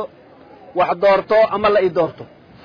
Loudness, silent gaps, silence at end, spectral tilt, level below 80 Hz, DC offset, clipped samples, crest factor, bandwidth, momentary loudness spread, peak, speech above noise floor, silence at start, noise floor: -16 LUFS; none; 0.4 s; -7 dB/octave; -52 dBFS; under 0.1%; under 0.1%; 12 dB; 5.2 kHz; 10 LU; -6 dBFS; 28 dB; 0 s; -44 dBFS